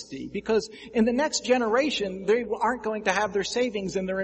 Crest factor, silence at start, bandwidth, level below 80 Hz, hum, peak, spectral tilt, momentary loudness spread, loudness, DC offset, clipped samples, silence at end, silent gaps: 18 dB; 0 s; 8.4 kHz; -56 dBFS; none; -8 dBFS; -4 dB/octave; 6 LU; -26 LUFS; under 0.1%; under 0.1%; 0 s; none